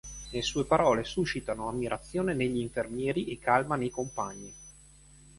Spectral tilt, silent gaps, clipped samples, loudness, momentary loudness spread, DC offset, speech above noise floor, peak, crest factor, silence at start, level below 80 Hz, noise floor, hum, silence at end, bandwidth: -5 dB/octave; none; under 0.1%; -30 LUFS; 12 LU; under 0.1%; 25 dB; -10 dBFS; 22 dB; 0.05 s; -52 dBFS; -55 dBFS; none; 0.1 s; 11.5 kHz